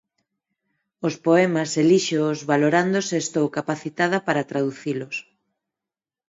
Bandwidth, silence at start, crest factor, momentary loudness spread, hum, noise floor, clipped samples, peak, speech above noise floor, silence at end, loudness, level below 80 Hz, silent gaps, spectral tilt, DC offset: 8 kHz; 1 s; 18 dB; 10 LU; none; -89 dBFS; under 0.1%; -4 dBFS; 68 dB; 1.05 s; -22 LUFS; -70 dBFS; none; -5 dB/octave; under 0.1%